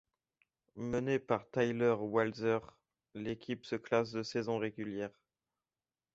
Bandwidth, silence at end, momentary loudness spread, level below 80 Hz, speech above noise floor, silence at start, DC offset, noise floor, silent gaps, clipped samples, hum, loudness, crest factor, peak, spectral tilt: 7.8 kHz; 1.05 s; 11 LU; -70 dBFS; over 55 dB; 0.75 s; under 0.1%; under -90 dBFS; none; under 0.1%; none; -36 LUFS; 20 dB; -16 dBFS; -5 dB/octave